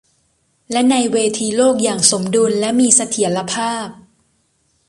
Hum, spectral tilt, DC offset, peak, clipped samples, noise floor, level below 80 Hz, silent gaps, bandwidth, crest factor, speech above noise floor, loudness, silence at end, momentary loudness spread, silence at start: none; -3 dB/octave; under 0.1%; 0 dBFS; under 0.1%; -62 dBFS; -60 dBFS; none; 11.5 kHz; 18 dB; 47 dB; -15 LUFS; 0.95 s; 9 LU; 0.7 s